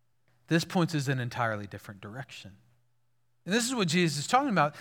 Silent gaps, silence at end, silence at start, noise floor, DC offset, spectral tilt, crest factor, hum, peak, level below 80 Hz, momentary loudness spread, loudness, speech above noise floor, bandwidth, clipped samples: none; 0 s; 0.5 s; -77 dBFS; under 0.1%; -4.5 dB/octave; 22 dB; none; -10 dBFS; -74 dBFS; 18 LU; -28 LUFS; 48 dB; 18 kHz; under 0.1%